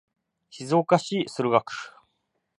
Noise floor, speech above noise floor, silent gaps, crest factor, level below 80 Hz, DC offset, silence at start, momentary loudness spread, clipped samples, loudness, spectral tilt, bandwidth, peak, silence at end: -76 dBFS; 52 dB; none; 24 dB; -74 dBFS; under 0.1%; 0.55 s; 17 LU; under 0.1%; -24 LUFS; -5.5 dB/octave; 11.5 kHz; -4 dBFS; 0.7 s